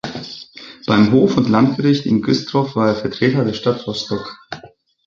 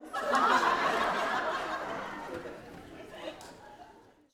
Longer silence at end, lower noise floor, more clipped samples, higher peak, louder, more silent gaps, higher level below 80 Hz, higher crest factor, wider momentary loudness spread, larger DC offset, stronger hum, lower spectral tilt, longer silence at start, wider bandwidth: about the same, 0.4 s vs 0.35 s; second, -44 dBFS vs -57 dBFS; neither; first, -2 dBFS vs -12 dBFS; first, -16 LUFS vs -30 LUFS; neither; first, -50 dBFS vs -64 dBFS; about the same, 16 dB vs 20 dB; second, 19 LU vs 22 LU; neither; neither; first, -7 dB/octave vs -3 dB/octave; about the same, 0.05 s vs 0 s; second, 7.4 kHz vs 17.5 kHz